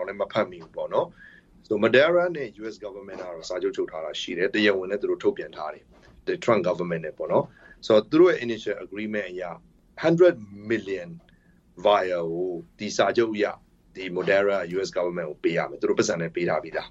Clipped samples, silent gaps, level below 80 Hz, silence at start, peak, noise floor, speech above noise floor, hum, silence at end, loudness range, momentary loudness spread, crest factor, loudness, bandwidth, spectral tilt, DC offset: under 0.1%; none; -62 dBFS; 0 s; -6 dBFS; -58 dBFS; 33 dB; none; 0 s; 3 LU; 17 LU; 20 dB; -25 LUFS; 8 kHz; -5 dB/octave; under 0.1%